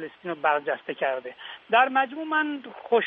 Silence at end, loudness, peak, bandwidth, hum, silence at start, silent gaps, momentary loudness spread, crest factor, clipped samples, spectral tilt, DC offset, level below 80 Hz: 0 s; -25 LUFS; -8 dBFS; 4.6 kHz; none; 0 s; none; 14 LU; 18 dB; under 0.1%; -0.5 dB/octave; under 0.1%; -80 dBFS